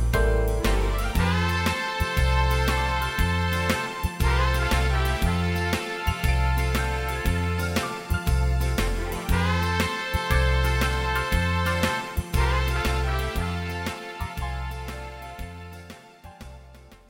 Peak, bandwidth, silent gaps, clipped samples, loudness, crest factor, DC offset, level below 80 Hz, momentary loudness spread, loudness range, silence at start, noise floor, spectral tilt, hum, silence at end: -8 dBFS; 17 kHz; none; under 0.1%; -25 LUFS; 16 dB; under 0.1%; -28 dBFS; 12 LU; 5 LU; 0 s; -48 dBFS; -5 dB/octave; none; 0.15 s